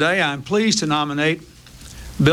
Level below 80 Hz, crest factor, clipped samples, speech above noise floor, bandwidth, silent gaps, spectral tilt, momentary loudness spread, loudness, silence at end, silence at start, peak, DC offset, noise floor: -44 dBFS; 20 dB; under 0.1%; 20 dB; 15.5 kHz; none; -4.5 dB/octave; 19 LU; -19 LUFS; 0 s; 0 s; 0 dBFS; under 0.1%; -39 dBFS